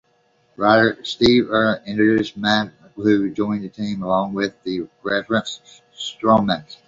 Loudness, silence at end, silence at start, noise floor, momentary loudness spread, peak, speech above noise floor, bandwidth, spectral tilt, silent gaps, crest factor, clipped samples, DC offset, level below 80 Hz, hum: -19 LUFS; 0.15 s; 0.6 s; -61 dBFS; 12 LU; -2 dBFS; 42 dB; 7.8 kHz; -5.5 dB/octave; none; 18 dB; under 0.1%; under 0.1%; -52 dBFS; none